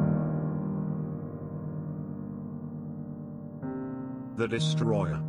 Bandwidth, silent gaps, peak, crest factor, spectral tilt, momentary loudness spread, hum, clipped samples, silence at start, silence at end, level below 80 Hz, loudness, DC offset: 10.5 kHz; none; -14 dBFS; 18 dB; -7 dB/octave; 11 LU; none; under 0.1%; 0 s; 0 s; -58 dBFS; -33 LUFS; under 0.1%